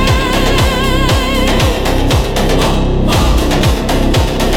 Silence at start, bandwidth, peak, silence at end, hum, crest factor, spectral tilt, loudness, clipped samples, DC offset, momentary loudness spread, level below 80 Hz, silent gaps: 0 s; 17.5 kHz; 0 dBFS; 0 s; none; 10 dB; -5 dB/octave; -12 LUFS; under 0.1%; under 0.1%; 1 LU; -16 dBFS; none